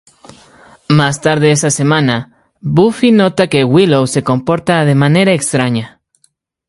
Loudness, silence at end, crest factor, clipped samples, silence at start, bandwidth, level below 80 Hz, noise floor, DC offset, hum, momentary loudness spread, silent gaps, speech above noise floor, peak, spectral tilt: -12 LUFS; 0.8 s; 12 dB; under 0.1%; 0.9 s; 11.5 kHz; -48 dBFS; -58 dBFS; under 0.1%; none; 6 LU; none; 47 dB; 0 dBFS; -5.5 dB/octave